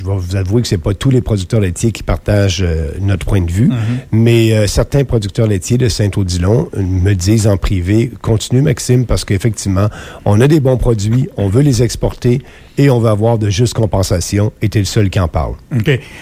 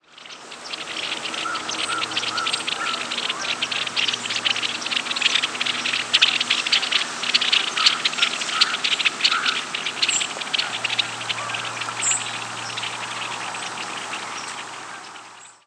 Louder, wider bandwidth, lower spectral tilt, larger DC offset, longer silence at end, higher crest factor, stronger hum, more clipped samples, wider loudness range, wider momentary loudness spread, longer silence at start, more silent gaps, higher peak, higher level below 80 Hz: first, -13 LUFS vs -21 LUFS; first, 15.5 kHz vs 11 kHz; first, -6.5 dB/octave vs 0.5 dB/octave; neither; second, 0 s vs 0.15 s; second, 12 dB vs 22 dB; neither; neither; second, 1 LU vs 7 LU; second, 6 LU vs 13 LU; second, 0 s vs 0.15 s; neither; about the same, 0 dBFS vs -2 dBFS; first, -28 dBFS vs -74 dBFS